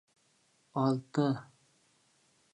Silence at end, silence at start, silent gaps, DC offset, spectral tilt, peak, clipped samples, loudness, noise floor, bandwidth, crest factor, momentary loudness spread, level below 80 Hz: 1.1 s; 0.75 s; none; under 0.1%; -8 dB/octave; -16 dBFS; under 0.1%; -33 LUFS; -71 dBFS; 10 kHz; 20 dB; 9 LU; -80 dBFS